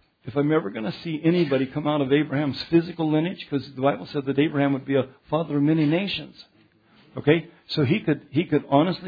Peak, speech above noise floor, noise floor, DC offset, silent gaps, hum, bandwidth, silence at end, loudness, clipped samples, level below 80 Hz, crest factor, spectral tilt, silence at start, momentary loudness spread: -4 dBFS; 35 dB; -58 dBFS; under 0.1%; none; none; 5 kHz; 0 s; -24 LUFS; under 0.1%; -62 dBFS; 18 dB; -9 dB/octave; 0.25 s; 8 LU